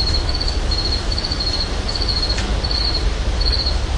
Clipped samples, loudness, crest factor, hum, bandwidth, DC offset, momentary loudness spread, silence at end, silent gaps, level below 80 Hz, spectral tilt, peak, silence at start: under 0.1%; -19 LUFS; 12 dB; none; 11 kHz; under 0.1%; 3 LU; 0 s; none; -20 dBFS; -4 dB/octave; -6 dBFS; 0 s